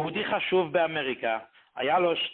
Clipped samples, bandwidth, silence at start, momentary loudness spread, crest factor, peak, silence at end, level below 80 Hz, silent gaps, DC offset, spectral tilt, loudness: under 0.1%; 4.4 kHz; 0 s; 8 LU; 14 dB; -12 dBFS; 0 s; -68 dBFS; none; under 0.1%; -9 dB/octave; -27 LUFS